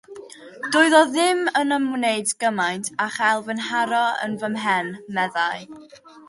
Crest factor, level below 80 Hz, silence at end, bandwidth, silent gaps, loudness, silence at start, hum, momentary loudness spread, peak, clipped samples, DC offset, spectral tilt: 20 dB; -72 dBFS; 0.1 s; 11.5 kHz; none; -21 LUFS; 0.1 s; none; 14 LU; -2 dBFS; under 0.1%; under 0.1%; -3 dB/octave